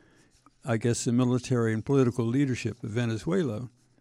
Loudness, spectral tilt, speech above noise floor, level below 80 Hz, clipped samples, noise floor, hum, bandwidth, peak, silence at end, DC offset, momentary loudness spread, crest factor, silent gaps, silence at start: -27 LUFS; -6.5 dB/octave; 34 dB; -60 dBFS; under 0.1%; -61 dBFS; none; 12 kHz; -12 dBFS; 0.35 s; under 0.1%; 8 LU; 16 dB; none; 0.65 s